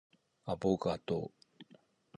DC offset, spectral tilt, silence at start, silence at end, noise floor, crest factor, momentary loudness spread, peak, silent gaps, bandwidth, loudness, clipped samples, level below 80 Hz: under 0.1%; -7.5 dB/octave; 0.45 s; 0.55 s; -66 dBFS; 22 dB; 15 LU; -16 dBFS; none; 10.5 kHz; -36 LUFS; under 0.1%; -64 dBFS